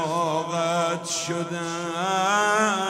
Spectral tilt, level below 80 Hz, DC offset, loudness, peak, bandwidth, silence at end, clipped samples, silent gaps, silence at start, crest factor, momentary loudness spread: -3.5 dB/octave; -70 dBFS; under 0.1%; -24 LUFS; -8 dBFS; 16 kHz; 0 s; under 0.1%; none; 0 s; 18 dB; 8 LU